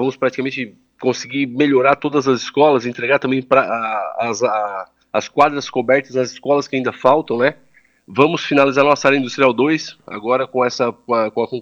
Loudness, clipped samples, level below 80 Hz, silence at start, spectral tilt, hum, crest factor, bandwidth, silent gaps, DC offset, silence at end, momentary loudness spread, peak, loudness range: -17 LUFS; under 0.1%; -64 dBFS; 0 s; -5 dB/octave; none; 16 dB; 7.6 kHz; none; under 0.1%; 0 s; 9 LU; 0 dBFS; 2 LU